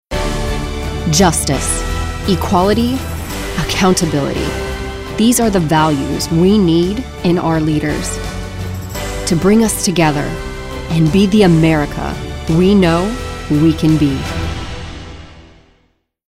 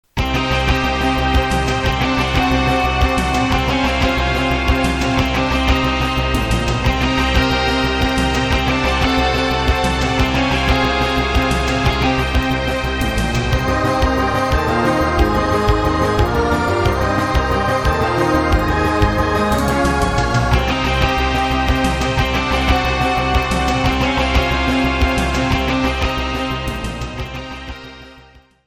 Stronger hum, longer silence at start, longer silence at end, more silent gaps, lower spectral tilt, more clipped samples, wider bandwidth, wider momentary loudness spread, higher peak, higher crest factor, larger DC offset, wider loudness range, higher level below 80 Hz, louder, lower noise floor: neither; about the same, 0.1 s vs 0.15 s; first, 0.85 s vs 0.45 s; neither; about the same, -5 dB/octave vs -5.5 dB/octave; neither; about the same, 16 kHz vs 15.5 kHz; first, 13 LU vs 3 LU; about the same, 0 dBFS vs 0 dBFS; about the same, 14 dB vs 16 dB; first, 0.2% vs under 0.1%; about the same, 3 LU vs 1 LU; about the same, -26 dBFS vs -22 dBFS; about the same, -15 LUFS vs -16 LUFS; first, -59 dBFS vs -46 dBFS